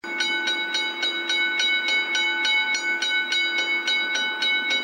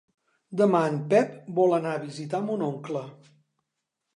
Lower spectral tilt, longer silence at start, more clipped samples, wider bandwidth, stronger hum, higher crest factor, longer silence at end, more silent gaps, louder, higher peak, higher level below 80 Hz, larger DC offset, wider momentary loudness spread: second, 1.5 dB/octave vs -7 dB/octave; second, 0.05 s vs 0.5 s; neither; first, 16 kHz vs 11 kHz; neither; about the same, 14 dB vs 18 dB; second, 0 s vs 1 s; neither; first, -21 LUFS vs -26 LUFS; about the same, -10 dBFS vs -8 dBFS; second, -86 dBFS vs -80 dBFS; neither; second, 3 LU vs 12 LU